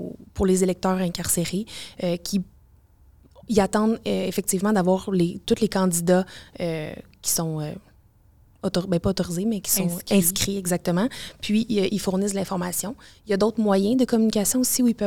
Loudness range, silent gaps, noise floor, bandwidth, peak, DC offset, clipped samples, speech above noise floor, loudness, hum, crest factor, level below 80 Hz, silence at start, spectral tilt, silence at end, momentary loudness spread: 4 LU; none; -56 dBFS; 19 kHz; -6 dBFS; 0.3%; under 0.1%; 33 dB; -23 LUFS; none; 18 dB; -50 dBFS; 0 s; -4.5 dB/octave; 0 s; 11 LU